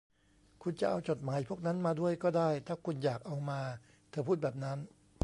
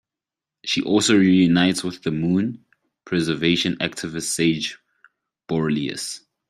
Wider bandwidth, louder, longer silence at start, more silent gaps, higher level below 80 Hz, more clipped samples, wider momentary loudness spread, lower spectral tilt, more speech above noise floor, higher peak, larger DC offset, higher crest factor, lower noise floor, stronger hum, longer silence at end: second, 11.5 kHz vs 15 kHz; second, -36 LUFS vs -21 LUFS; about the same, 0.6 s vs 0.65 s; neither; second, -70 dBFS vs -58 dBFS; neither; about the same, 11 LU vs 13 LU; first, -7.5 dB/octave vs -4.5 dB/octave; second, 33 dB vs 68 dB; second, -16 dBFS vs -4 dBFS; neither; about the same, 20 dB vs 18 dB; second, -67 dBFS vs -88 dBFS; neither; about the same, 0.35 s vs 0.3 s